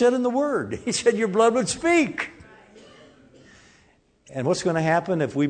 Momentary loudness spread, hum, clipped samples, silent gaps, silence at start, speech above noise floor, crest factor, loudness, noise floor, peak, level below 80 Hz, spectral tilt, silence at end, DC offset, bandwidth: 8 LU; none; under 0.1%; none; 0 s; 38 dB; 18 dB; -23 LUFS; -60 dBFS; -6 dBFS; -60 dBFS; -5 dB/octave; 0 s; under 0.1%; 9.4 kHz